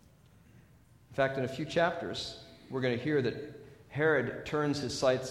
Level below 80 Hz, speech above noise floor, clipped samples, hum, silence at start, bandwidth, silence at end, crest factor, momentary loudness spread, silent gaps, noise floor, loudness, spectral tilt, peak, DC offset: -62 dBFS; 29 dB; under 0.1%; none; 1.1 s; 14 kHz; 0 s; 18 dB; 14 LU; none; -60 dBFS; -32 LUFS; -5.5 dB/octave; -14 dBFS; under 0.1%